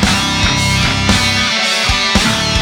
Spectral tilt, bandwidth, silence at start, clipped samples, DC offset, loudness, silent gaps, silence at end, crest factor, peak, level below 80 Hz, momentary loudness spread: -3 dB/octave; 19 kHz; 0 s; under 0.1%; under 0.1%; -12 LUFS; none; 0 s; 14 dB; 0 dBFS; -24 dBFS; 1 LU